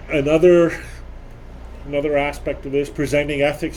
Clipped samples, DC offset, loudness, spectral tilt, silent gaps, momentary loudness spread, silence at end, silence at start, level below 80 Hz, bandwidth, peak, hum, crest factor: under 0.1%; under 0.1%; -18 LUFS; -6.5 dB/octave; none; 24 LU; 0 s; 0 s; -36 dBFS; 15 kHz; -2 dBFS; none; 16 dB